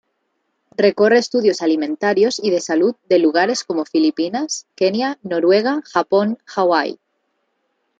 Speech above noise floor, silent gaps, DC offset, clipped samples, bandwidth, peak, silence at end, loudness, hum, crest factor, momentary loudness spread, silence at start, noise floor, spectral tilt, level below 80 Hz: 53 dB; none; under 0.1%; under 0.1%; 9 kHz; -2 dBFS; 1.05 s; -17 LUFS; none; 16 dB; 7 LU; 0.8 s; -70 dBFS; -4 dB/octave; -70 dBFS